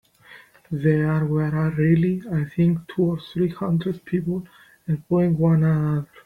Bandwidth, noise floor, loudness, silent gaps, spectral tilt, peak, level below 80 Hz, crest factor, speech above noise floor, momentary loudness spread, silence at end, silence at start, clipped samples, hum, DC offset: 4.4 kHz; -49 dBFS; -22 LUFS; none; -10 dB/octave; -8 dBFS; -52 dBFS; 14 dB; 28 dB; 9 LU; 0.2 s; 0.3 s; under 0.1%; none; under 0.1%